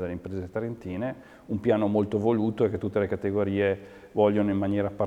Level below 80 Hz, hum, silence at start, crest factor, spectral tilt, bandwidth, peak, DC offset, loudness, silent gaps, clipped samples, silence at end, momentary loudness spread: -56 dBFS; none; 0 s; 18 dB; -9 dB/octave; 8.4 kHz; -8 dBFS; under 0.1%; -27 LUFS; none; under 0.1%; 0 s; 10 LU